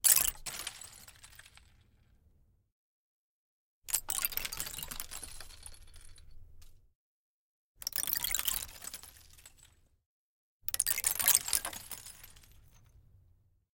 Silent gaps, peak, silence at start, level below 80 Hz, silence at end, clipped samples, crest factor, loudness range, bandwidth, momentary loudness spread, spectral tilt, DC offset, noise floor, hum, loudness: 2.72-3.82 s, 6.95-7.75 s, 10.06-10.60 s; -6 dBFS; 0.05 s; -58 dBFS; 0.95 s; under 0.1%; 32 dB; 12 LU; 17 kHz; 26 LU; 1 dB/octave; under 0.1%; -68 dBFS; none; -32 LUFS